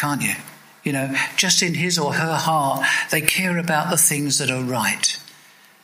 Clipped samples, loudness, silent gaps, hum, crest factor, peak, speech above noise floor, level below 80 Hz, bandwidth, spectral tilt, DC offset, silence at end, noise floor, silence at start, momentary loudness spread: under 0.1%; -19 LUFS; none; none; 22 dB; 0 dBFS; 29 dB; -60 dBFS; 16 kHz; -2.5 dB/octave; under 0.1%; 0.5 s; -50 dBFS; 0 s; 8 LU